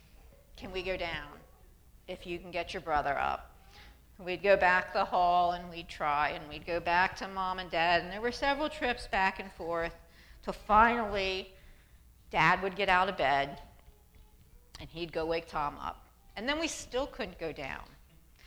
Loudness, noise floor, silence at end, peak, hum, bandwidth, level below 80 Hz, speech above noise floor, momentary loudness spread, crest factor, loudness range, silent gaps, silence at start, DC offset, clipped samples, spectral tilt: -31 LUFS; -59 dBFS; 0 s; -10 dBFS; none; over 20 kHz; -52 dBFS; 27 dB; 15 LU; 24 dB; 8 LU; none; 0.55 s; under 0.1%; under 0.1%; -4 dB/octave